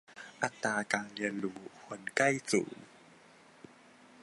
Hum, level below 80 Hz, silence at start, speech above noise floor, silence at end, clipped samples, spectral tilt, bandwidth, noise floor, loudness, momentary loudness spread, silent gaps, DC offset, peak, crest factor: none; -78 dBFS; 0.1 s; 26 dB; 0 s; under 0.1%; -3.5 dB/octave; 11.5 kHz; -59 dBFS; -34 LUFS; 18 LU; none; under 0.1%; -10 dBFS; 26 dB